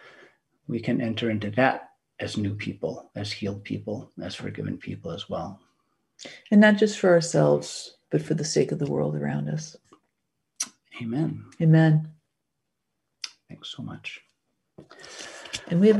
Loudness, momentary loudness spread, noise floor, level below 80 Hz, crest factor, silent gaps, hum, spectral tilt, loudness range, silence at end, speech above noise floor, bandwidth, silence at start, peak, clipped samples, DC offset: -25 LUFS; 20 LU; -81 dBFS; -64 dBFS; 22 dB; none; none; -6 dB/octave; 12 LU; 0 s; 57 dB; 11.5 kHz; 0.7 s; -6 dBFS; under 0.1%; under 0.1%